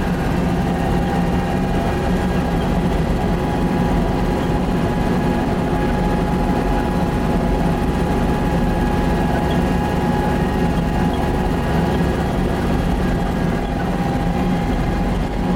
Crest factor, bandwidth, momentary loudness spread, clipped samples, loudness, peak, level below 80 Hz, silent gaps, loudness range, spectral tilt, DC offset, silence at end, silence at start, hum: 12 dB; 16.5 kHz; 1 LU; under 0.1%; -19 LUFS; -6 dBFS; -24 dBFS; none; 1 LU; -7.5 dB/octave; under 0.1%; 0 s; 0 s; none